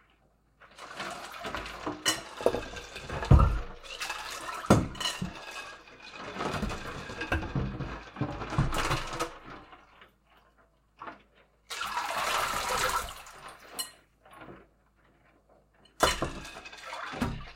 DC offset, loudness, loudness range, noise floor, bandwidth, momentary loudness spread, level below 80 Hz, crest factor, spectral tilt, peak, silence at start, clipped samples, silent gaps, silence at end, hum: under 0.1%; -32 LUFS; 7 LU; -67 dBFS; 16.5 kHz; 20 LU; -40 dBFS; 28 dB; -4.5 dB/octave; -4 dBFS; 0.6 s; under 0.1%; none; 0 s; none